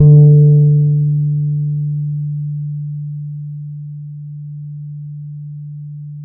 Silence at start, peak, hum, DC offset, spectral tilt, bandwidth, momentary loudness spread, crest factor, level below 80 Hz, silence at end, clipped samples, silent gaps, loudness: 0 s; 0 dBFS; none; under 0.1%; -20 dB/octave; 0.8 kHz; 21 LU; 14 dB; -48 dBFS; 0 s; under 0.1%; none; -14 LUFS